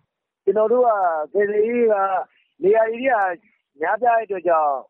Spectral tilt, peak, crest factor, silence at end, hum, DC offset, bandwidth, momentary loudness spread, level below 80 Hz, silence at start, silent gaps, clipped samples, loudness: -4 dB/octave; -8 dBFS; 12 dB; 0.1 s; none; under 0.1%; 3.6 kHz; 9 LU; -70 dBFS; 0.45 s; none; under 0.1%; -20 LUFS